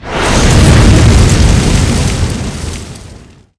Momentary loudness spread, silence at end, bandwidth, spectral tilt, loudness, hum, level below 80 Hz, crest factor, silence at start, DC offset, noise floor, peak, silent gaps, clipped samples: 16 LU; 0.4 s; 11 kHz; -5 dB/octave; -9 LUFS; none; -14 dBFS; 8 dB; 0 s; under 0.1%; -35 dBFS; 0 dBFS; none; 3%